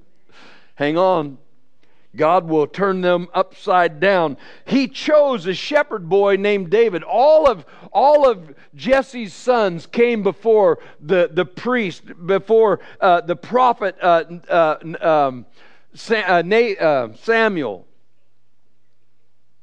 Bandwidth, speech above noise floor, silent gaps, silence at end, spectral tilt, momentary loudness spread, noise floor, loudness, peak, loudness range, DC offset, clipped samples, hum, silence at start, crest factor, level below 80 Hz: 9.2 kHz; 52 dB; none; 1.85 s; -6 dB/octave; 9 LU; -69 dBFS; -17 LUFS; -2 dBFS; 3 LU; 0.8%; under 0.1%; none; 0.8 s; 16 dB; -56 dBFS